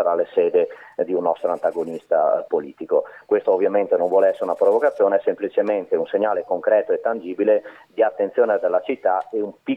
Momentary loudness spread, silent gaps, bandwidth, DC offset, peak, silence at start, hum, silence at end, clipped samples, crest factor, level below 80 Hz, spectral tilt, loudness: 6 LU; none; 4.1 kHz; under 0.1%; -6 dBFS; 0 s; none; 0 s; under 0.1%; 14 dB; -74 dBFS; -7 dB/octave; -21 LUFS